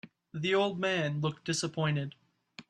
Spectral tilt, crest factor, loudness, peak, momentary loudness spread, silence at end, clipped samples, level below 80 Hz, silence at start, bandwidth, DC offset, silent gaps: -5 dB/octave; 16 dB; -31 LUFS; -16 dBFS; 7 LU; 0.1 s; under 0.1%; -72 dBFS; 0.05 s; 11 kHz; under 0.1%; none